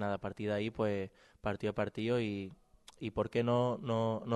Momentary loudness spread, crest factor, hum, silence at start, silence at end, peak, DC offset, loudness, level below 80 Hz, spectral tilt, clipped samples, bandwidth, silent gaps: 10 LU; 16 dB; none; 0 s; 0 s; -18 dBFS; under 0.1%; -36 LUFS; -62 dBFS; -7.5 dB/octave; under 0.1%; 11.5 kHz; none